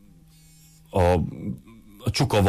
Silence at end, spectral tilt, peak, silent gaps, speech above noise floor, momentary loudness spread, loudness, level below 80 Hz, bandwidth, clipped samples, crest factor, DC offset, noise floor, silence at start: 0 s; -6 dB/octave; -10 dBFS; none; 30 dB; 14 LU; -25 LUFS; -42 dBFS; 15.5 kHz; under 0.1%; 14 dB; under 0.1%; -52 dBFS; 0.95 s